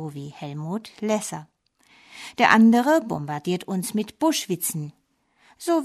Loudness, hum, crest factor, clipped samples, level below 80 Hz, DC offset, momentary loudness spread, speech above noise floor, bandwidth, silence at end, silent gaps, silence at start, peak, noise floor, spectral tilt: -23 LUFS; none; 22 dB; under 0.1%; -68 dBFS; under 0.1%; 20 LU; 41 dB; 13.5 kHz; 0 s; none; 0 s; -2 dBFS; -64 dBFS; -4.5 dB/octave